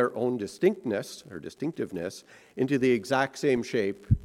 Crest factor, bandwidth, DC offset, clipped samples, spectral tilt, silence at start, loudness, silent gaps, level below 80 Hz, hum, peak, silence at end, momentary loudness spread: 18 dB; 14 kHz; under 0.1%; under 0.1%; -6.5 dB/octave; 0 s; -28 LUFS; none; -48 dBFS; none; -10 dBFS; 0 s; 15 LU